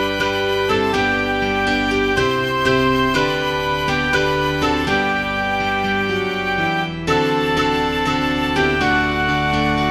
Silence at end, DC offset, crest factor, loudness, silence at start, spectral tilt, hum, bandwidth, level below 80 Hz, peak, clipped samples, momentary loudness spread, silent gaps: 0 s; under 0.1%; 14 dB; -18 LUFS; 0 s; -5 dB/octave; none; 15.5 kHz; -36 dBFS; -4 dBFS; under 0.1%; 3 LU; none